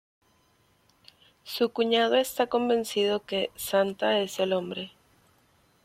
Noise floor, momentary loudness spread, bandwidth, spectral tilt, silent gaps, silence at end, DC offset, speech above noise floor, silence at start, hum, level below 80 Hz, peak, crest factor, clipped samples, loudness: -66 dBFS; 9 LU; 16.5 kHz; -3.5 dB/octave; none; 0.95 s; under 0.1%; 39 dB; 1.45 s; none; -68 dBFS; -10 dBFS; 18 dB; under 0.1%; -27 LUFS